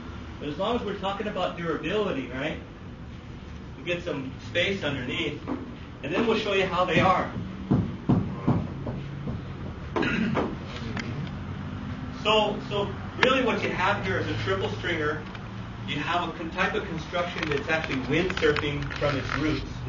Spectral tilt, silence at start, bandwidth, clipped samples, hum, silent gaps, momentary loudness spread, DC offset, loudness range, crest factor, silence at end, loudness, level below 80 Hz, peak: -6 dB/octave; 0 s; 7.4 kHz; under 0.1%; none; none; 13 LU; under 0.1%; 5 LU; 28 dB; 0 s; -28 LUFS; -44 dBFS; 0 dBFS